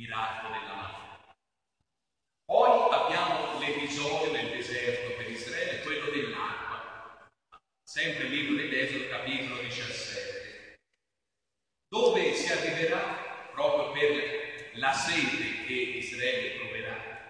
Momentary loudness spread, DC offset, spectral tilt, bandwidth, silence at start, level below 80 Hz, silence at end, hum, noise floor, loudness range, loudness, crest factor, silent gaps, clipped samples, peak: 13 LU; under 0.1%; -3 dB/octave; 10.5 kHz; 0 s; -68 dBFS; 0 s; none; -87 dBFS; 6 LU; -30 LUFS; 22 dB; none; under 0.1%; -10 dBFS